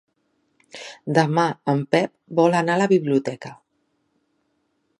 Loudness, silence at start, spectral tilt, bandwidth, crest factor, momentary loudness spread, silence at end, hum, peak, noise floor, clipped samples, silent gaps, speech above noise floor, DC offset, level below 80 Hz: -21 LUFS; 0.75 s; -6.5 dB/octave; 11.5 kHz; 22 dB; 19 LU; 1.45 s; none; -2 dBFS; -70 dBFS; under 0.1%; none; 50 dB; under 0.1%; -72 dBFS